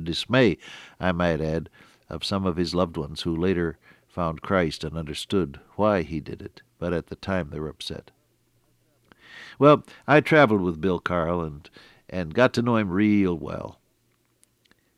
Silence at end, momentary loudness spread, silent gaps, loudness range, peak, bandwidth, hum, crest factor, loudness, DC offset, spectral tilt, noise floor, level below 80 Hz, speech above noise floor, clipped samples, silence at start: 1.25 s; 18 LU; none; 7 LU; -4 dBFS; 13.5 kHz; none; 22 dB; -24 LUFS; under 0.1%; -6.5 dB/octave; -68 dBFS; -48 dBFS; 44 dB; under 0.1%; 0 s